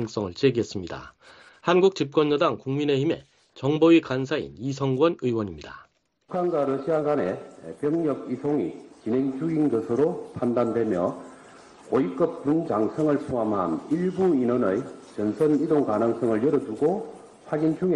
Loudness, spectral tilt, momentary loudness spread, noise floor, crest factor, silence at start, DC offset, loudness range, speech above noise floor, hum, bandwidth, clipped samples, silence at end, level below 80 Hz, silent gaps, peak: -25 LUFS; -7.5 dB/octave; 11 LU; -49 dBFS; 18 dB; 0 s; under 0.1%; 4 LU; 25 dB; none; 9.8 kHz; under 0.1%; 0 s; -60 dBFS; none; -6 dBFS